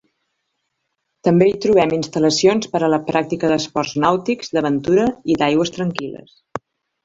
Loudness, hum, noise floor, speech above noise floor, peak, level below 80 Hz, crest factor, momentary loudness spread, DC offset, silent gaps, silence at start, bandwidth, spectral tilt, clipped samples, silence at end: -18 LUFS; none; -74 dBFS; 57 dB; -2 dBFS; -54 dBFS; 18 dB; 15 LU; under 0.1%; none; 1.25 s; 7.8 kHz; -5.5 dB/octave; under 0.1%; 0.45 s